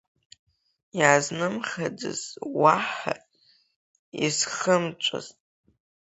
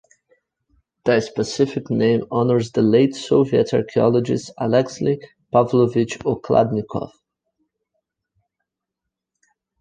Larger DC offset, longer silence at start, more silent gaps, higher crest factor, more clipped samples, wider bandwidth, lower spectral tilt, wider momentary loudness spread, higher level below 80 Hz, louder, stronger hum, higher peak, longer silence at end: neither; about the same, 0.95 s vs 1.05 s; first, 3.76-4.12 s vs none; first, 26 dB vs 18 dB; neither; second, 8.2 kHz vs 9.6 kHz; second, -3 dB/octave vs -7 dB/octave; first, 16 LU vs 8 LU; second, -70 dBFS vs -56 dBFS; second, -25 LUFS vs -19 LUFS; neither; about the same, -2 dBFS vs -2 dBFS; second, 0.7 s vs 2.7 s